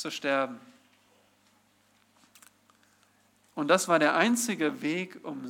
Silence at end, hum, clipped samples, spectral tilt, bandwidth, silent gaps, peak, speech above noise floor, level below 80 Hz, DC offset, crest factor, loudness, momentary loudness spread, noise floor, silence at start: 0 s; 50 Hz at -65 dBFS; under 0.1%; -3.5 dB/octave; 17.5 kHz; none; -8 dBFS; 39 dB; -86 dBFS; under 0.1%; 24 dB; -27 LUFS; 14 LU; -66 dBFS; 0 s